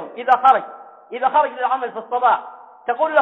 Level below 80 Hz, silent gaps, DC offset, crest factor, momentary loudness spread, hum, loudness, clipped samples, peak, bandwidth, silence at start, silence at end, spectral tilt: -68 dBFS; none; under 0.1%; 16 dB; 17 LU; none; -18 LUFS; under 0.1%; -2 dBFS; 4.5 kHz; 0 s; 0 s; -4.5 dB/octave